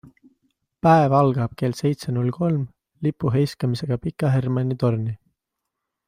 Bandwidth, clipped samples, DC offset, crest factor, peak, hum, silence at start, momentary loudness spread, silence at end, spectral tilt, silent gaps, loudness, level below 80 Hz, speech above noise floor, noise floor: 15 kHz; under 0.1%; under 0.1%; 18 dB; -4 dBFS; none; 0.85 s; 10 LU; 0.95 s; -8 dB/octave; none; -22 LUFS; -54 dBFS; 61 dB; -82 dBFS